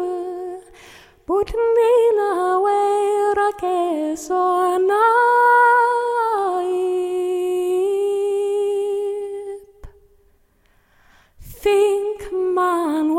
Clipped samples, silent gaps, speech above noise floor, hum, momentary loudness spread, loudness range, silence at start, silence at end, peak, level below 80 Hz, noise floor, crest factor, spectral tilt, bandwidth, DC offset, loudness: under 0.1%; none; 42 dB; none; 12 LU; 8 LU; 0 s; 0 s; -6 dBFS; -48 dBFS; -58 dBFS; 14 dB; -4 dB/octave; 16 kHz; under 0.1%; -18 LUFS